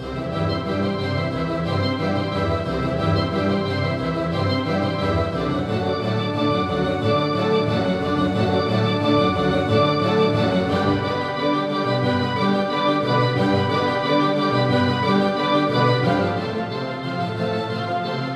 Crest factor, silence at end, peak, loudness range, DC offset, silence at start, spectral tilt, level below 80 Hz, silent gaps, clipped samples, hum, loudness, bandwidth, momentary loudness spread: 16 dB; 0 s; -6 dBFS; 3 LU; under 0.1%; 0 s; -7 dB/octave; -44 dBFS; none; under 0.1%; none; -21 LUFS; 12 kHz; 5 LU